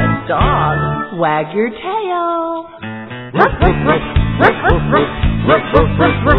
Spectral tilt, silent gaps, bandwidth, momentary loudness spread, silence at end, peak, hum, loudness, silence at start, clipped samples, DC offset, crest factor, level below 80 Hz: -9.5 dB/octave; none; 5.4 kHz; 10 LU; 0 s; 0 dBFS; none; -14 LUFS; 0 s; 0.1%; under 0.1%; 14 dB; -24 dBFS